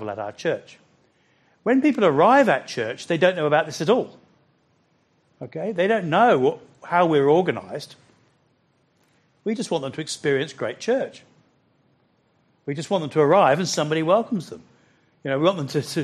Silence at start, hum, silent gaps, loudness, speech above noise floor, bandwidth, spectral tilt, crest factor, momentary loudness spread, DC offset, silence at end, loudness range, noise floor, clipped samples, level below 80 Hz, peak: 0 s; none; none; -21 LUFS; 44 dB; 13 kHz; -5.5 dB/octave; 20 dB; 16 LU; under 0.1%; 0 s; 8 LU; -65 dBFS; under 0.1%; -70 dBFS; -4 dBFS